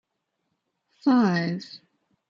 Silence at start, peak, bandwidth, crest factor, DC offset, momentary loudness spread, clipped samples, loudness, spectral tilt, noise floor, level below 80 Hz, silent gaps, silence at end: 1.05 s; -10 dBFS; 7.2 kHz; 18 dB; under 0.1%; 15 LU; under 0.1%; -24 LUFS; -7 dB/octave; -78 dBFS; -72 dBFS; none; 0.5 s